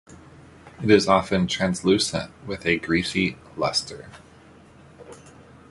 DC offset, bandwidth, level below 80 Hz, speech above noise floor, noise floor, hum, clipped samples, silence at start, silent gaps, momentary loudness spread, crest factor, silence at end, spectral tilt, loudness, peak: under 0.1%; 11.5 kHz; -50 dBFS; 27 dB; -50 dBFS; none; under 0.1%; 0.1 s; none; 12 LU; 22 dB; 0.4 s; -4.5 dB/octave; -22 LUFS; -2 dBFS